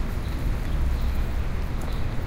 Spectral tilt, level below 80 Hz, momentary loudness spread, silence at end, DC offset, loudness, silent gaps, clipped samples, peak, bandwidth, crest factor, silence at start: -6.5 dB/octave; -26 dBFS; 3 LU; 0 s; under 0.1%; -29 LUFS; none; under 0.1%; -14 dBFS; 16 kHz; 10 dB; 0 s